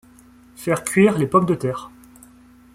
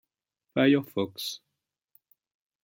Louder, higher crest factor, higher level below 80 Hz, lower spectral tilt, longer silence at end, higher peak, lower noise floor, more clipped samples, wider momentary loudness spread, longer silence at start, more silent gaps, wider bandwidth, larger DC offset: first, -19 LUFS vs -27 LUFS; about the same, 18 dB vs 20 dB; first, -54 dBFS vs -72 dBFS; about the same, -6 dB/octave vs -5.5 dB/octave; second, 0.85 s vs 1.25 s; first, -4 dBFS vs -10 dBFS; second, -49 dBFS vs -85 dBFS; neither; about the same, 13 LU vs 13 LU; about the same, 0.6 s vs 0.55 s; neither; about the same, 16 kHz vs 16.5 kHz; neither